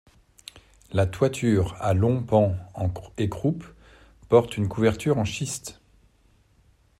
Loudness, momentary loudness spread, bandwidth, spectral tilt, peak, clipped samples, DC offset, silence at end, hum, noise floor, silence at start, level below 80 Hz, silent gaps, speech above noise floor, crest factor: -25 LUFS; 14 LU; 13.5 kHz; -6.5 dB/octave; -4 dBFS; under 0.1%; under 0.1%; 1.3 s; none; -61 dBFS; 0.55 s; -50 dBFS; none; 38 dB; 20 dB